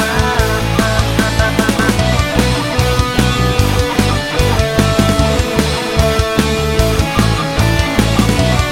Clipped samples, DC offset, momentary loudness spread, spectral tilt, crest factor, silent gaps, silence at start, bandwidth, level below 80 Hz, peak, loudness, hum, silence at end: under 0.1%; under 0.1%; 2 LU; -5 dB/octave; 12 dB; none; 0 s; 17.5 kHz; -20 dBFS; 0 dBFS; -13 LUFS; none; 0 s